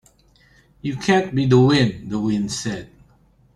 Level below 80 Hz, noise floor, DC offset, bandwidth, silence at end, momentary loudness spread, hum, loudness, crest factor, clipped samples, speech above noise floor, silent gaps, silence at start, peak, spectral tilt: -50 dBFS; -56 dBFS; under 0.1%; 11.5 kHz; 0.7 s; 15 LU; none; -19 LUFS; 18 dB; under 0.1%; 37 dB; none; 0.85 s; -2 dBFS; -6 dB/octave